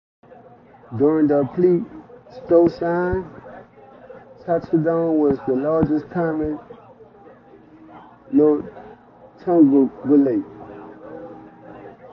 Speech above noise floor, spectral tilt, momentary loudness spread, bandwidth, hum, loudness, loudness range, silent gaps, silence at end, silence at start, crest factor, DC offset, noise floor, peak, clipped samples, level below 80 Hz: 29 dB; -11 dB/octave; 22 LU; 5.6 kHz; none; -19 LUFS; 4 LU; none; 0.05 s; 0.9 s; 18 dB; under 0.1%; -47 dBFS; -2 dBFS; under 0.1%; -48 dBFS